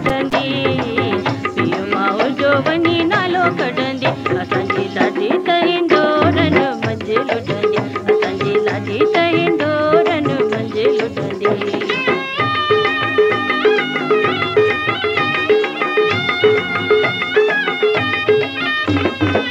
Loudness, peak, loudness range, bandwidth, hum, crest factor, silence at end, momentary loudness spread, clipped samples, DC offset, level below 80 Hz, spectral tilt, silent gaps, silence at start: -16 LUFS; 0 dBFS; 1 LU; 8.6 kHz; none; 16 dB; 0 s; 5 LU; under 0.1%; under 0.1%; -52 dBFS; -6 dB/octave; none; 0 s